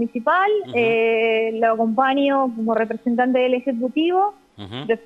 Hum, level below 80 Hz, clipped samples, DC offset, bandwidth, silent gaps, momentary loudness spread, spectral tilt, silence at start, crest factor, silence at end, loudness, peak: none; -68 dBFS; under 0.1%; under 0.1%; 5.8 kHz; none; 5 LU; -7 dB/octave; 0 s; 14 dB; 0.05 s; -19 LUFS; -4 dBFS